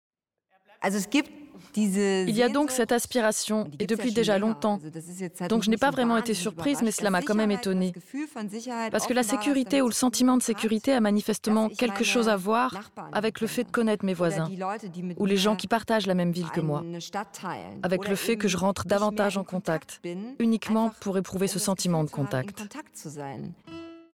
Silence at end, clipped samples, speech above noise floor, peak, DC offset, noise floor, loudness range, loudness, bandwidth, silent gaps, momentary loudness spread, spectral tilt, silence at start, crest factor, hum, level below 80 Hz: 0.15 s; under 0.1%; 44 dB; -12 dBFS; under 0.1%; -71 dBFS; 3 LU; -26 LUFS; 17 kHz; none; 12 LU; -4.5 dB/octave; 0.8 s; 16 dB; none; -64 dBFS